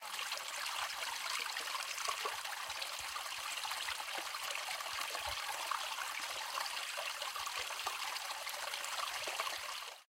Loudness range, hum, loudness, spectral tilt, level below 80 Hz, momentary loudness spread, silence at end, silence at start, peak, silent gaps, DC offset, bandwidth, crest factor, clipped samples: 1 LU; none; -39 LUFS; 2 dB/octave; -72 dBFS; 3 LU; 0.05 s; 0 s; -22 dBFS; none; under 0.1%; 16.5 kHz; 20 dB; under 0.1%